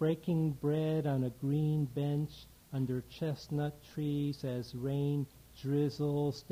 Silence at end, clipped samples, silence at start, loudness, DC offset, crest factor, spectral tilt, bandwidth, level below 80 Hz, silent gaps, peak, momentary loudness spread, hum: 0.1 s; under 0.1%; 0 s; -35 LUFS; under 0.1%; 14 dB; -8.5 dB/octave; 16 kHz; -62 dBFS; none; -20 dBFS; 7 LU; none